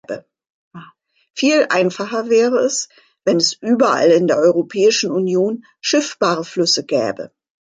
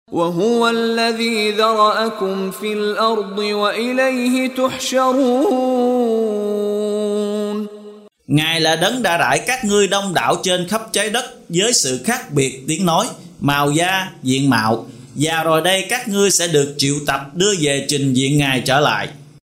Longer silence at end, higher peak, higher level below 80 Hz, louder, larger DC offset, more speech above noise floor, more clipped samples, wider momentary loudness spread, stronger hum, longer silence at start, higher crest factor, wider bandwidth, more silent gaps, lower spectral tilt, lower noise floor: first, 0.4 s vs 0.2 s; about the same, -2 dBFS vs -2 dBFS; second, -68 dBFS vs -54 dBFS; about the same, -16 LUFS vs -17 LUFS; neither; first, 30 dB vs 22 dB; neither; first, 10 LU vs 6 LU; neither; about the same, 0.1 s vs 0.1 s; about the same, 14 dB vs 16 dB; second, 9.6 kHz vs 16 kHz; first, 0.50-0.71 s vs none; about the same, -3.5 dB/octave vs -3.5 dB/octave; first, -46 dBFS vs -39 dBFS